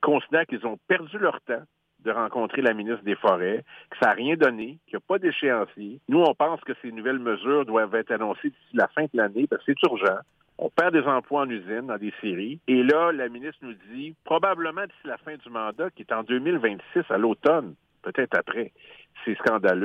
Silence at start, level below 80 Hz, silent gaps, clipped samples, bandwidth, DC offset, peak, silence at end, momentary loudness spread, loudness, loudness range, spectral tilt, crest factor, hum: 0 s; -76 dBFS; none; under 0.1%; 8.2 kHz; under 0.1%; -8 dBFS; 0 s; 13 LU; -25 LUFS; 2 LU; -7 dB/octave; 18 dB; none